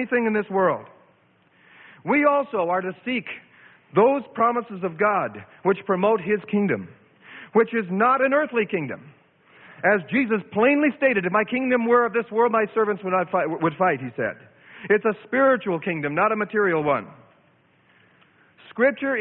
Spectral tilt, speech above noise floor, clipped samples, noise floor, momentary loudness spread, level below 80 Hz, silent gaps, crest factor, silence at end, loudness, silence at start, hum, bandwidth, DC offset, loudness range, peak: -11 dB/octave; 38 dB; under 0.1%; -60 dBFS; 10 LU; -68 dBFS; none; 16 dB; 0 s; -22 LUFS; 0 s; none; 4.1 kHz; under 0.1%; 4 LU; -6 dBFS